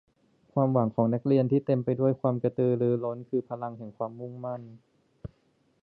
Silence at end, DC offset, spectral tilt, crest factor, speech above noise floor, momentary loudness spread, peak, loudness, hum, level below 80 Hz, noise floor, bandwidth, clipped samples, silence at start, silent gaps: 0.55 s; under 0.1%; -12.5 dB/octave; 20 dB; 42 dB; 14 LU; -10 dBFS; -28 LUFS; none; -64 dBFS; -69 dBFS; 4.5 kHz; under 0.1%; 0.55 s; none